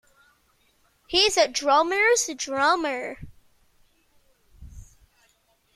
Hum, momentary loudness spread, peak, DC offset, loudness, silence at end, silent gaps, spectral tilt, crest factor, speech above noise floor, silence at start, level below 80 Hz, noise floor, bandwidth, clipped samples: none; 12 LU; -6 dBFS; under 0.1%; -22 LUFS; 0.9 s; none; -1 dB/octave; 20 dB; 43 dB; 1.1 s; -54 dBFS; -66 dBFS; 14 kHz; under 0.1%